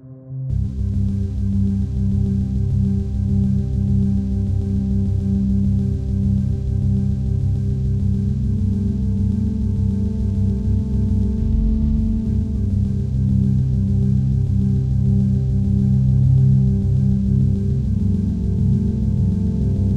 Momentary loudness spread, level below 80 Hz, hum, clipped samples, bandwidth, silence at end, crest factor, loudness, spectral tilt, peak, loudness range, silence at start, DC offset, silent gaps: 4 LU; -24 dBFS; none; under 0.1%; 4.3 kHz; 0 s; 12 dB; -19 LUFS; -11 dB/octave; -6 dBFS; 3 LU; 0.05 s; under 0.1%; none